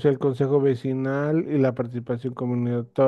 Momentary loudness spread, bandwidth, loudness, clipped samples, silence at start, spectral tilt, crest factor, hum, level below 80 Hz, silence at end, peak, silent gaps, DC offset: 7 LU; 6.6 kHz; -24 LUFS; under 0.1%; 0 s; -9.5 dB/octave; 16 dB; none; -64 dBFS; 0 s; -8 dBFS; none; under 0.1%